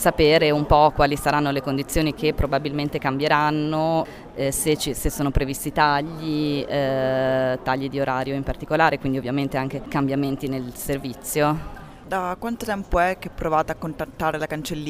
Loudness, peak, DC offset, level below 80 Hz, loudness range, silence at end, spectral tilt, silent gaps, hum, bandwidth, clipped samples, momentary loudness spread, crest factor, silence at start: -23 LUFS; -2 dBFS; under 0.1%; -36 dBFS; 5 LU; 0 s; -5 dB/octave; none; none; 16 kHz; under 0.1%; 10 LU; 20 dB; 0 s